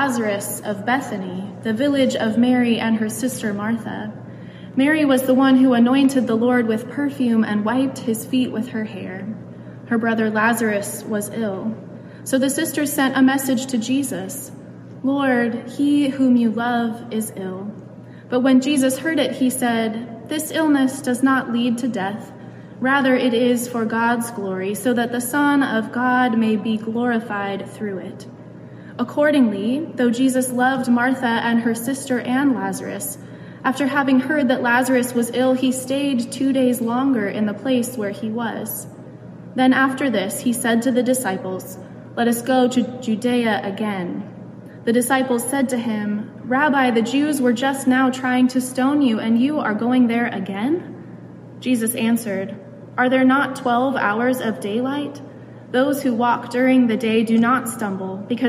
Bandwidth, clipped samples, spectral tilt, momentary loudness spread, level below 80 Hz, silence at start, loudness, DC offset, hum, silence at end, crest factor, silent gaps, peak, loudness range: 15.5 kHz; under 0.1%; -4.5 dB/octave; 14 LU; -66 dBFS; 0 s; -20 LUFS; under 0.1%; none; 0 s; 14 dB; none; -4 dBFS; 4 LU